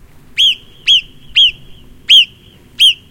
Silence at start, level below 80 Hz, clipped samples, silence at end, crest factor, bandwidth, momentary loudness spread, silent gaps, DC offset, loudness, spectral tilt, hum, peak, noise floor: 0.35 s; -44 dBFS; 0.1%; 0.15 s; 14 dB; 17 kHz; 10 LU; none; under 0.1%; -9 LUFS; 1.5 dB/octave; none; 0 dBFS; -42 dBFS